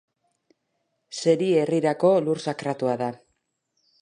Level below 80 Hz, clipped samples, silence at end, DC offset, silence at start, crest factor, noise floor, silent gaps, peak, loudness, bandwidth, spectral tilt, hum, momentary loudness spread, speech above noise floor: -74 dBFS; under 0.1%; 0.85 s; under 0.1%; 1.1 s; 18 dB; -76 dBFS; none; -6 dBFS; -23 LUFS; 10.5 kHz; -6 dB/octave; none; 8 LU; 53 dB